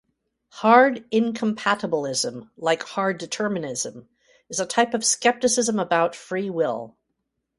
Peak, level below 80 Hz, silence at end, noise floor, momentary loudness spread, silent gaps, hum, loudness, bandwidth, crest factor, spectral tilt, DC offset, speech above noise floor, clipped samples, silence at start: -2 dBFS; -68 dBFS; 0.7 s; -78 dBFS; 11 LU; none; none; -22 LUFS; 11.5 kHz; 22 dB; -3 dB/octave; under 0.1%; 55 dB; under 0.1%; 0.55 s